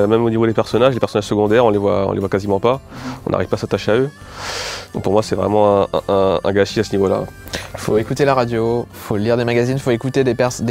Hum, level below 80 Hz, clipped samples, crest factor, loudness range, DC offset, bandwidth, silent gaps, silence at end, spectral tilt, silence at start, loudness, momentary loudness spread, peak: none; -44 dBFS; under 0.1%; 16 dB; 3 LU; under 0.1%; 16 kHz; none; 0 s; -6 dB/octave; 0 s; -17 LUFS; 9 LU; 0 dBFS